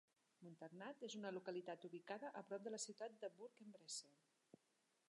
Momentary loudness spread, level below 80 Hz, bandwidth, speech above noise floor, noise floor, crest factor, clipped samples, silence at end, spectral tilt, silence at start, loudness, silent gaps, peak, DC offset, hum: 10 LU; under -90 dBFS; 11 kHz; 31 dB; -85 dBFS; 20 dB; under 0.1%; 0.95 s; -3 dB/octave; 0.4 s; -54 LUFS; none; -36 dBFS; under 0.1%; none